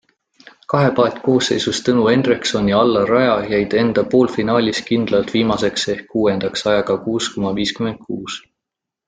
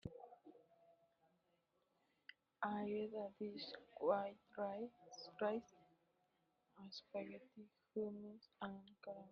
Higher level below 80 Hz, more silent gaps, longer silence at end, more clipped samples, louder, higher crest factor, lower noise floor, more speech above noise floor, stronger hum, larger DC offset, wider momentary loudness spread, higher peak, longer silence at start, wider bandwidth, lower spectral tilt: first, -50 dBFS vs -82 dBFS; neither; first, 0.7 s vs 0 s; neither; first, -17 LUFS vs -48 LUFS; second, 16 dB vs 24 dB; about the same, -83 dBFS vs -83 dBFS; first, 66 dB vs 36 dB; neither; neither; second, 7 LU vs 21 LU; first, -2 dBFS vs -26 dBFS; first, 0.7 s vs 0.05 s; first, 9.4 kHz vs 6.8 kHz; about the same, -5 dB/octave vs -4 dB/octave